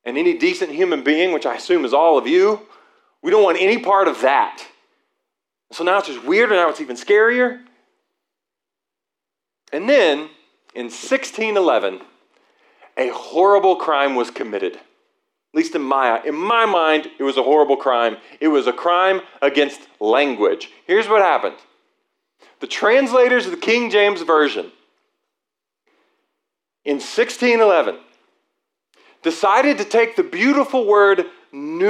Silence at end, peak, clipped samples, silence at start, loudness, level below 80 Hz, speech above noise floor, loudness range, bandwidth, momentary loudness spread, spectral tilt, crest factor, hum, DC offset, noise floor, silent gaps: 0 s; -4 dBFS; under 0.1%; 0.05 s; -17 LUFS; -84 dBFS; 68 dB; 5 LU; 11.5 kHz; 13 LU; -3.5 dB/octave; 16 dB; none; under 0.1%; -85 dBFS; none